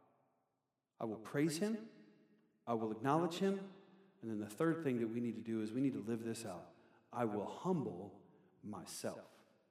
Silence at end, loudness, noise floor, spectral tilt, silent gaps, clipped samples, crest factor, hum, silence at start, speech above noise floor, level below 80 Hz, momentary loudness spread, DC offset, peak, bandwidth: 0.45 s; -41 LUFS; -88 dBFS; -6 dB/octave; none; under 0.1%; 20 dB; none; 1 s; 48 dB; under -90 dBFS; 16 LU; under 0.1%; -22 dBFS; 15.5 kHz